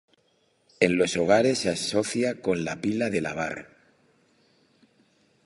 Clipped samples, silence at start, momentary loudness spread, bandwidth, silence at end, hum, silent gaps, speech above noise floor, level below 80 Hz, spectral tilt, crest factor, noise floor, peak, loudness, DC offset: under 0.1%; 0.8 s; 9 LU; 11.5 kHz; 1.8 s; none; none; 43 dB; -60 dBFS; -4.5 dB/octave; 24 dB; -67 dBFS; -4 dBFS; -25 LUFS; under 0.1%